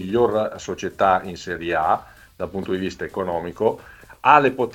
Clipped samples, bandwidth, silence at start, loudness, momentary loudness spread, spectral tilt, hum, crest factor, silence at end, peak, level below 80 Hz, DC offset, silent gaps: under 0.1%; 17 kHz; 0 s; -21 LUFS; 14 LU; -5.5 dB/octave; none; 22 dB; 0 s; 0 dBFS; -52 dBFS; under 0.1%; none